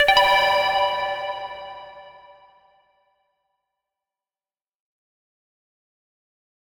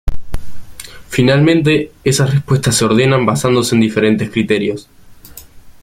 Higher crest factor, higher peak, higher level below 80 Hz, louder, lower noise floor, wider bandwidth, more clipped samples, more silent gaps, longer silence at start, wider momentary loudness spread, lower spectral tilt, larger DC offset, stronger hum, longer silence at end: first, 22 dB vs 14 dB; second, -4 dBFS vs 0 dBFS; second, -54 dBFS vs -30 dBFS; second, -20 LUFS vs -13 LUFS; first, under -90 dBFS vs -37 dBFS; first, 19 kHz vs 16 kHz; neither; neither; about the same, 0 s vs 0.05 s; first, 23 LU vs 19 LU; second, -1 dB/octave vs -5.5 dB/octave; neither; neither; first, 4.6 s vs 0.1 s